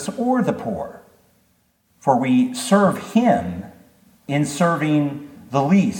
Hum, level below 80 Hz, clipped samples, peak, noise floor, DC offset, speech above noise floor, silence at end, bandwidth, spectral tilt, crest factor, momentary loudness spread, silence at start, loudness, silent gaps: none; -56 dBFS; under 0.1%; -2 dBFS; -63 dBFS; under 0.1%; 44 dB; 0 s; 17.5 kHz; -6 dB/octave; 18 dB; 13 LU; 0 s; -20 LUFS; none